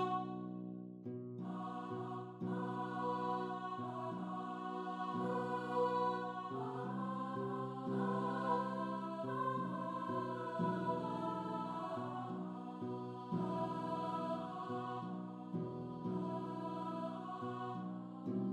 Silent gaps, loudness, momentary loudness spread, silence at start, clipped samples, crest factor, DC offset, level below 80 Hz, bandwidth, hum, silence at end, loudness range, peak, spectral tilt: none; -42 LUFS; 8 LU; 0 s; under 0.1%; 16 dB; under 0.1%; -82 dBFS; 10.5 kHz; none; 0 s; 4 LU; -24 dBFS; -8 dB/octave